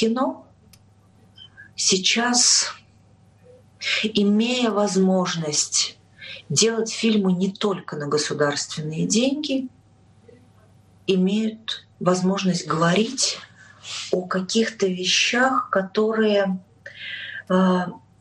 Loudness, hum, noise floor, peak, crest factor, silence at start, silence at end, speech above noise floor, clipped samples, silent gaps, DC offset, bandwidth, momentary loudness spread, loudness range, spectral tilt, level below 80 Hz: -21 LUFS; none; -54 dBFS; -4 dBFS; 18 dB; 0 s; 0.2 s; 33 dB; under 0.1%; none; under 0.1%; 11.5 kHz; 14 LU; 5 LU; -3.5 dB/octave; -66 dBFS